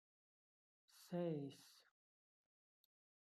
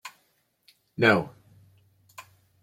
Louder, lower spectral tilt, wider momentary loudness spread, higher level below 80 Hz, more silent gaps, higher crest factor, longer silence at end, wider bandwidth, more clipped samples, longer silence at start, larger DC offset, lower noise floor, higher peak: second, -48 LUFS vs -23 LUFS; about the same, -7 dB/octave vs -6 dB/octave; second, 21 LU vs 27 LU; second, under -90 dBFS vs -68 dBFS; neither; second, 20 dB vs 26 dB; first, 1.45 s vs 0.4 s; second, 14 kHz vs 16.5 kHz; neither; first, 0.95 s vs 0.05 s; neither; first, under -90 dBFS vs -70 dBFS; second, -34 dBFS vs -4 dBFS